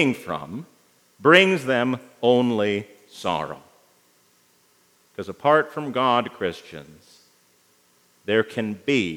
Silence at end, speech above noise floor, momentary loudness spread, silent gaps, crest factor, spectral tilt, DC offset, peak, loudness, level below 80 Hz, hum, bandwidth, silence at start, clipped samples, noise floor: 0 s; 39 dB; 22 LU; none; 24 dB; -5.5 dB/octave; under 0.1%; 0 dBFS; -22 LUFS; -70 dBFS; 60 Hz at -55 dBFS; 17.5 kHz; 0 s; under 0.1%; -61 dBFS